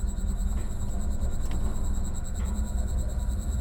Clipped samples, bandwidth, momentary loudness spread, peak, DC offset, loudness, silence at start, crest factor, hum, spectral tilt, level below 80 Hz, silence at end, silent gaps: under 0.1%; 16.5 kHz; 2 LU; -16 dBFS; under 0.1%; -32 LUFS; 0 s; 10 dB; none; -6 dB/octave; -28 dBFS; 0 s; none